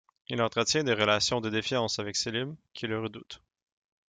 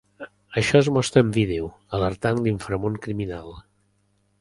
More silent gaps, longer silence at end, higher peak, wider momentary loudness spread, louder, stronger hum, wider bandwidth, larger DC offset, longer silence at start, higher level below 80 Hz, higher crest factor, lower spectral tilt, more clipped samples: neither; about the same, 0.7 s vs 0.8 s; second, -10 dBFS vs -2 dBFS; about the same, 14 LU vs 16 LU; second, -29 LUFS vs -23 LUFS; second, none vs 50 Hz at -45 dBFS; second, 9.6 kHz vs 11.5 kHz; neither; about the same, 0.3 s vs 0.2 s; second, -64 dBFS vs -46 dBFS; about the same, 20 dB vs 22 dB; second, -3.5 dB/octave vs -6 dB/octave; neither